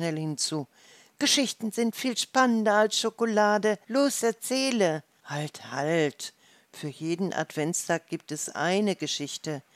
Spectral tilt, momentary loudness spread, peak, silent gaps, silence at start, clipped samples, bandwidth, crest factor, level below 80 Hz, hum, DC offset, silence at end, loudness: -3.5 dB/octave; 12 LU; -8 dBFS; none; 0 s; under 0.1%; 16 kHz; 20 dB; -84 dBFS; none; under 0.1%; 0.15 s; -27 LUFS